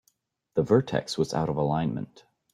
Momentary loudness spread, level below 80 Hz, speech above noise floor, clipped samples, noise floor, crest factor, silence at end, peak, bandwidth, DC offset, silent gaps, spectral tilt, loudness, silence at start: 9 LU; -58 dBFS; 45 dB; under 0.1%; -71 dBFS; 18 dB; 0.5 s; -8 dBFS; 12.5 kHz; under 0.1%; none; -6.5 dB/octave; -27 LUFS; 0.55 s